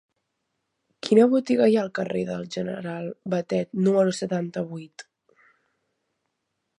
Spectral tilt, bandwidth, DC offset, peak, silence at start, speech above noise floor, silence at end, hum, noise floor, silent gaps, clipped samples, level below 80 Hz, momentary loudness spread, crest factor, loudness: -6.5 dB/octave; 10.5 kHz; under 0.1%; -6 dBFS; 1.05 s; 56 dB; 1.75 s; none; -79 dBFS; none; under 0.1%; -70 dBFS; 14 LU; 20 dB; -24 LUFS